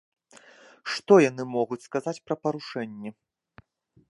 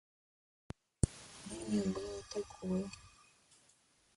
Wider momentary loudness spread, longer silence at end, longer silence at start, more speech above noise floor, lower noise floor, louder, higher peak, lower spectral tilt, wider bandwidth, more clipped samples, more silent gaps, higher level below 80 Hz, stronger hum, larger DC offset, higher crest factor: about the same, 19 LU vs 18 LU; about the same, 1.05 s vs 1.05 s; second, 0.85 s vs 1.05 s; about the same, 32 dB vs 33 dB; second, -57 dBFS vs -71 dBFS; first, -26 LUFS vs -40 LUFS; first, -4 dBFS vs -12 dBFS; about the same, -5.5 dB/octave vs -6 dB/octave; about the same, 11.5 kHz vs 11.5 kHz; neither; neither; second, -76 dBFS vs -54 dBFS; neither; neither; second, 24 dB vs 30 dB